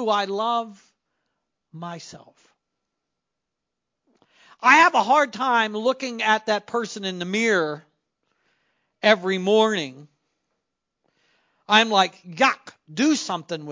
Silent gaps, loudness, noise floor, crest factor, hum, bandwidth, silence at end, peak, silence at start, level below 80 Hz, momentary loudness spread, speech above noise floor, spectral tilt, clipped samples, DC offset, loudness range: none; -21 LUFS; -83 dBFS; 24 dB; none; 7.6 kHz; 0 s; 0 dBFS; 0 s; -78 dBFS; 19 LU; 62 dB; -3.5 dB/octave; under 0.1%; under 0.1%; 5 LU